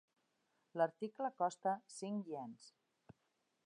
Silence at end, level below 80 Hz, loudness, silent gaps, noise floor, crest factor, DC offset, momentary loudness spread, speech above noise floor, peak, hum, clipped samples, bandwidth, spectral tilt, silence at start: 0.95 s; under -90 dBFS; -42 LUFS; none; -84 dBFS; 20 dB; under 0.1%; 11 LU; 42 dB; -24 dBFS; none; under 0.1%; 11 kHz; -5.5 dB/octave; 0.75 s